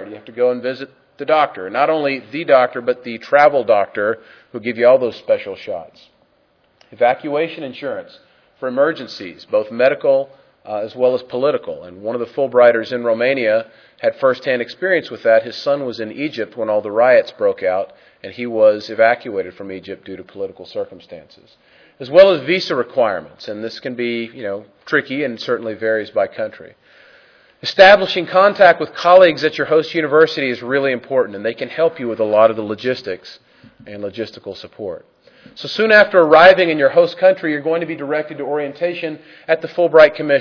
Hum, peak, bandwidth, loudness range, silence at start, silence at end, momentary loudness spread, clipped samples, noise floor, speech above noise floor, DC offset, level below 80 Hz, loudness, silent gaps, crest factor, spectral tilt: none; 0 dBFS; 5.4 kHz; 9 LU; 0 s; 0 s; 19 LU; 0.1%; -59 dBFS; 43 dB; under 0.1%; -60 dBFS; -16 LUFS; none; 16 dB; -5.5 dB/octave